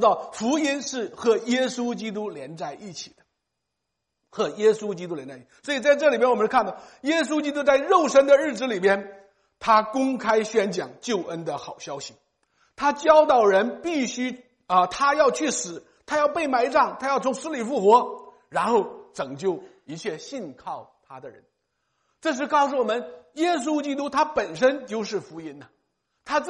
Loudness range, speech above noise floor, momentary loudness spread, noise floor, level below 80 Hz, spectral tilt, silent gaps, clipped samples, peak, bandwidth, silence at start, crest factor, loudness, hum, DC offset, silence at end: 8 LU; 58 dB; 18 LU; -81 dBFS; -64 dBFS; -4 dB/octave; none; under 0.1%; -4 dBFS; 11 kHz; 0 s; 20 dB; -23 LUFS; none; under 0.1%; 0 s